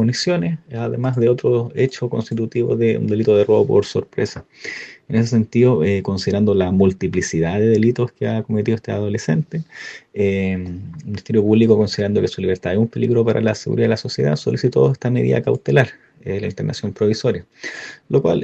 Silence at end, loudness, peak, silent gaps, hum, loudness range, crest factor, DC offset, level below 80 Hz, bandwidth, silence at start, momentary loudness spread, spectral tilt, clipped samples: 0 s; -18 LUFS; 0 dBFS; none; none; 3 LU; 18 dB; under 0.1%; -56 dBFS; 8.4 kHz; 0 s; 12 LU; -7 dB/octave; under 0.1%